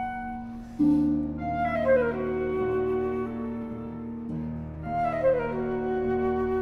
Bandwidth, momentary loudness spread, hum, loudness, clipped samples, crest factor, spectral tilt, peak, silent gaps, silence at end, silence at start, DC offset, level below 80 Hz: 6 kHz; 12 LU; none; -28 LUFS; under 0.1%; 16 dB; -9 dB/octave; -12 dBFS; none; 0 s; 0 s; under 0.1%; -48 dBFS